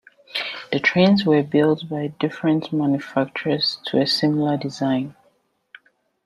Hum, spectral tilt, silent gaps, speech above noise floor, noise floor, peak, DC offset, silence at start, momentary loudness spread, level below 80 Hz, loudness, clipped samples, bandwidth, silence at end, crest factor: none; -6.5 dB/octave; none; 44 dB; -64 dBFS; -4 dBFS; under 0.1%; 0.35 s; 10 LU; -64 dBFS; -21 LUFS; under 0.1%; 12 kHz; 1.15 s; 18 dB